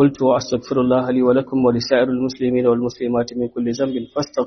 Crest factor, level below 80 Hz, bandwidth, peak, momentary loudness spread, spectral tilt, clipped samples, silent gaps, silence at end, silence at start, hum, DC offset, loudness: 16 dB; -52 dBFS; 6.4 kHz; -2 dBFS; 6 LU; -6 dB/octave; under 0.1%; none; 0 s; 0 s; none; under 0.1%; -19 LUFS